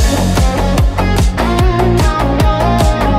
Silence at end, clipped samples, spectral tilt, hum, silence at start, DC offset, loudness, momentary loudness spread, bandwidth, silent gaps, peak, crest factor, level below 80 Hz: 0 s; under 0.1%; -6 dB/octave; none; 0 s; under 0.1%; -13 LUFS; 2 LU; 15.5 kHz; none; 0 dBFS; 10 dB; -14 dBFS